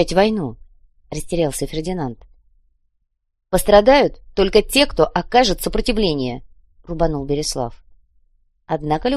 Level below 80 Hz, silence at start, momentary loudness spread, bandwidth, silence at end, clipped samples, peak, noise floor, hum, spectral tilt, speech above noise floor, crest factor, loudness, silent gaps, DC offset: -32 dBFS; 0 s; 15 LU; 13 kHz; 0 s; under 0.1%; 0 dBFS; -70 dBFS; none; -4.5 dB/octave; 53 dB; 20 dB; -18 LUFS; none; under 0.1%